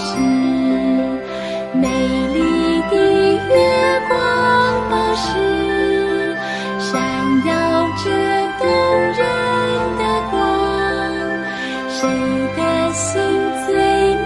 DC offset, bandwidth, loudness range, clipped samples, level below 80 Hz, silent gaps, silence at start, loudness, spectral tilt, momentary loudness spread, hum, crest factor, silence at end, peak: under 0.1%; 11.5 kHz; 4 LU; under 0.1%; -40 dBFS; none; 0 s; -17 LUFS; -4.5 dB/octave; 7 LU; none; 14 dB; 0 s; -2 dBFS